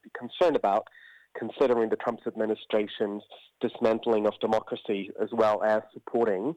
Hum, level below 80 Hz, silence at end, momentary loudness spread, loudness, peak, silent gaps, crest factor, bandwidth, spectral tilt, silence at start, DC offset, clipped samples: none; -68 dBFS; 0 s; 10 LU; -28 LUFS; -12 dBFS; none; 16 dB; 9 kHz; -6.5 dB/octave; 0.15 s; under 0.1%; under 0.1%